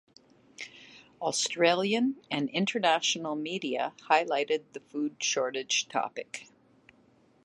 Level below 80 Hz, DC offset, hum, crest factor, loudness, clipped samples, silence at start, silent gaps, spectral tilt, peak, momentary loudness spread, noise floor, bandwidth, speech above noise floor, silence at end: -82 dBFS; under 0.1%; none; 24 dB; -29 LUFS; under 0.1%; 0.6 s; none; -2.5 dB/octave; -8 dBFS; 15 LU; -63 dBFS; 11.5 kHz; 34 dB; 1 s